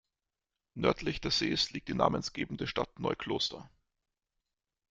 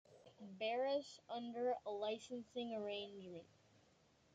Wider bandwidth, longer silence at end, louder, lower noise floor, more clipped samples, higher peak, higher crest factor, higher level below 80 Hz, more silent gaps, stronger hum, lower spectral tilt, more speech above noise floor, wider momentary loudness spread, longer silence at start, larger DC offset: about the same, 9.4 kHz vs 9 kHz; first, 1.25 s vs 0.9 s; first, -33 LUFS vs -45 LUFS; first, -90 dBFS vs -74 dBFS; neither; first, -10 dBFS vs -32 dBFS; first, 24 dB vs 16 dB; first, -56 dBFS vs -88 dBFS; neither; neither; about the same, -4.5 dB/octave vs -4.5 dB/octave; first, 56 dB vs 29 dB; second, 7 LU vs 15 LU; first, 0.75 s vs 0.1 s; neither